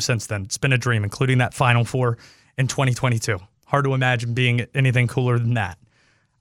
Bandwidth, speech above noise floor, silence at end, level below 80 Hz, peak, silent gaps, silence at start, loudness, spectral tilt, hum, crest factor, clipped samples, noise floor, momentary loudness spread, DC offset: 13.5 kHz; 41 dB; 0.65 s; -52 dBFS; -2 dBFS; none; 0 s; -21 LUFS; -5.5 dB/octave; none; 18 dB; under 0.1%; -61 dBFS; 7 LU; under 0.1%